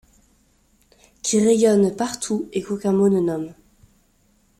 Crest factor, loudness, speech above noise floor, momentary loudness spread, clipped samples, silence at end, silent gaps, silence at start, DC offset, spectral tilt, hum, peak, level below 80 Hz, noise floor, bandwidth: 16 dB; -20 LUFS; 42 dB; 11 LU; under 0.1%; 1.05 s; none; 1.25 s; under 0.1%; -5.5 dB/octave; none; -6 dBFS; -58 dBFS; -61 dBFS; 15 kHz